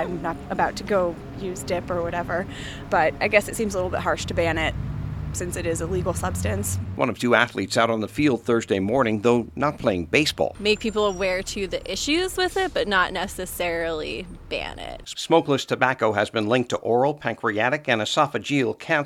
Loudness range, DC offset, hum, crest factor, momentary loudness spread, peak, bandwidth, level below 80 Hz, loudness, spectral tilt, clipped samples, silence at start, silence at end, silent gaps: 3 LU; under 0.1%; none; 22 dB; 9 LU; 0 dBFS; 17.5 kHz; -42 dBFS; -23 LUFS; -4.5 dB/octave; under 0.1%; 0 s; 0 s; none